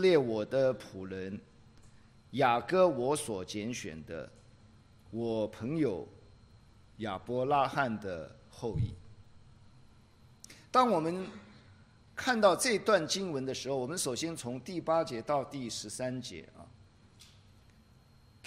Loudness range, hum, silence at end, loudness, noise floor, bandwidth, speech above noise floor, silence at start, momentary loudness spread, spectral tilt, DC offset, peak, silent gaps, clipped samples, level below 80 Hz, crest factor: 7 LU; none; 1.2 s; -32 LUFS; -61 dBFS; 15.5 kHz; 29 dB; 0 s; 17 LU; -4.5 dB/octave; under 0.1%; -12 dBFS; none; under 0.1%; -62 dBFS; 22 dB